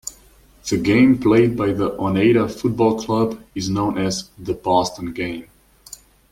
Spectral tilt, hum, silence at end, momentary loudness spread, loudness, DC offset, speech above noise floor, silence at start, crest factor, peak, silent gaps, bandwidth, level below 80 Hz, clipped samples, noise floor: -6 dB/octave; none; 0.35 s; 16 LU; -19 LUFS; under 0.1%; 32 dB; 0.05 s; 16 dB; -2 dBFS; none; 16 kHz; -48 dBFS; under 0.1%; -50 dBFS